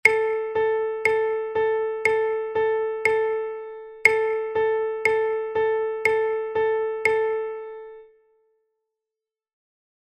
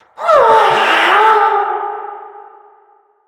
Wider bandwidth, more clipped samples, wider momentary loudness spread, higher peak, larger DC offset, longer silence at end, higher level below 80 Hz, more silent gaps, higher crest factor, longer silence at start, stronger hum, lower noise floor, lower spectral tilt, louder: second, 13 kHz vs 17.5 kHz; neither; second, 9 LU vs 17 LU; about the same, 0 dBFS vs 0 dBFS; neither; first, 2.05 s vs 0.85 s; about the same, -64 dBFS vs -60 dBFS; neither; first, 24 dB vs 14 dB; second, 0.05 s vs 0.2 s; neither; first, -89 dBFS vs -51 dBFS; about the same, -3 dB/octave vs -2.5 dB/octave; second, -23 LUFS vs -11 LUFS